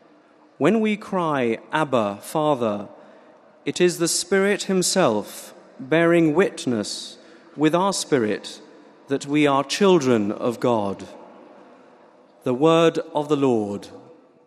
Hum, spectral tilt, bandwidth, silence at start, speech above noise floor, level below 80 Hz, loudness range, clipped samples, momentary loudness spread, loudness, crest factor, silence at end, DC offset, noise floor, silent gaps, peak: none; -4.5 dB/octave; 14 kHz; 0.6 s; 33 dB; -70 dBFS; 3 LU; under 0.1%; 17 LU; -21 LUFS; 18 dB; 0.45 s; under 0.1%; -54 dBFS; none; -4 dBFS